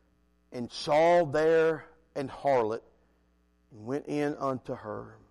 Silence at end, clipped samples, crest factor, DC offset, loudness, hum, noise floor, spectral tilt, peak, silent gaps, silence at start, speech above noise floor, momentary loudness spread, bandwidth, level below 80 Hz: 0.2 s; under 0.1%; 12 dB; under 0.1%; -29 LUFS; none; -68 dBFS; -6 dB/octave; -16 dBFS; none; 0.5 s; 40 dB; 17 LU; 11.5 kHz; -64 dBFS